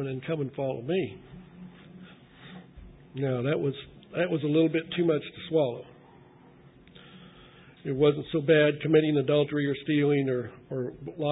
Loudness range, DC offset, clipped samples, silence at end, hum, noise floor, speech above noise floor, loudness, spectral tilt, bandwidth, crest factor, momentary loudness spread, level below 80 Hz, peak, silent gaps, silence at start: 9 LU; under 0.1%; under 0.1%; 0 s; none; -54 dBFS; 28 dB; -27 LUFS; -11 dB/octave; 4 kHz; 20 dB; 22 LU; -62 dBFS; -8 dBFS; none; 0 s